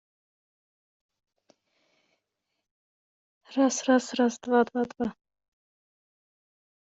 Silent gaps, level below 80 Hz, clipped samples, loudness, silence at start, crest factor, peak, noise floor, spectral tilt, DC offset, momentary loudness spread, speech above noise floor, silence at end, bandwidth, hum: none; -74 dBFS; under 0.1%; -26 LUFS; 3.5 s; 20 dB; -12 dBFS; -83 dBFS; -3.5 dB/octave; under 0.1%; 11 LU; 58 dB; 1.8 s; 8 kHz; none